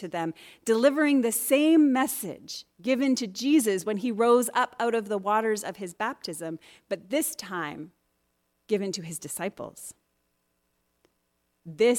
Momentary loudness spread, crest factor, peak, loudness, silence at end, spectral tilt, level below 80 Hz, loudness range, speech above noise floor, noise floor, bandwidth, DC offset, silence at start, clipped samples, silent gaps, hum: 17 LU; 18 dB; -8 dBFS; -26 LUFS; 0 s; -4 dB/octave; -74 dBFS; 12 LU; 49 dB; -75 dBFS; 18 kHz; under 0.1%; 0 s; under 0.1%; none; none